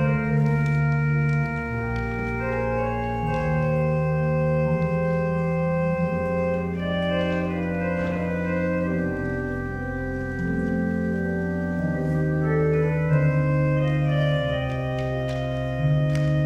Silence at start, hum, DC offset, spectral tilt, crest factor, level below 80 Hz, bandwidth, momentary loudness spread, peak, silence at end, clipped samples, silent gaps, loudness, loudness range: 0 s; none; under 0.1%; -8.5 dB/octave; 14 dB; -40 dBFS; 6.6 kHz; 5 LU; -10 dBFS; 0 s; under 0.1%; none; -24 LUFS; 4 LU